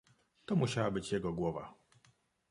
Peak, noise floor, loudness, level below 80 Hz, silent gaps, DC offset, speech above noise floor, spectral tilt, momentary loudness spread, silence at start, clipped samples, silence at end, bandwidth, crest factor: -18 dBFS; -71 dBFS; -36 LUFS; -62 dBFS; none; under 0.1%; 36 dB; -6 dB/octave; 16 LU; 0.5 s; under 0.1%; 0.8 s; 11.5 kHz; 20 dB